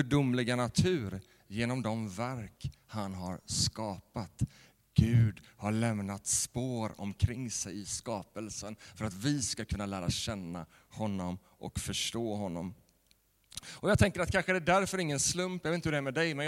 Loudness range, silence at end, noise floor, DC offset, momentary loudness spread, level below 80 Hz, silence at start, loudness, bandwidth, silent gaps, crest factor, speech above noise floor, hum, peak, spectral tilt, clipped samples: 5 LU; 0 s; -70 dBFS; under 0.1%; 14 LU; -52 dBFS; 0 s; -33 LUFS; 16 kHz; none; 22 dB; 37 dB; none; -10 dBFS; -4.5 dB/octave; under 0.1%